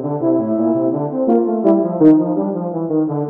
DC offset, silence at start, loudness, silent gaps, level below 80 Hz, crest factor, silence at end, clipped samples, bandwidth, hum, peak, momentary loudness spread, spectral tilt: under 0.1%; 0 s; -16 LUFS; none; -64 dBFS; 14 dB; 0 s; under 0.1%; 2.4 kHz; none; 0 dBFS; 8 LU; -12.5 dB/octave